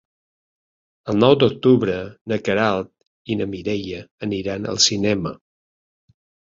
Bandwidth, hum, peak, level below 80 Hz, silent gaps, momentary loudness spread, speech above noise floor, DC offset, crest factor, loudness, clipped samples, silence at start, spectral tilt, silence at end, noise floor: 7.8 kHz; none; -2 dBFS; -52 dBFS; 2.21-2.25 s, 3.07-3.25 s, 4.11-4.18 s; 13 LU; over 70 dB; under 0.1%; 20 dB; -20 LUFS; under 0.1%; 1.05 s; -4.5 dB/octave; 1.2 s; under -90 dBFS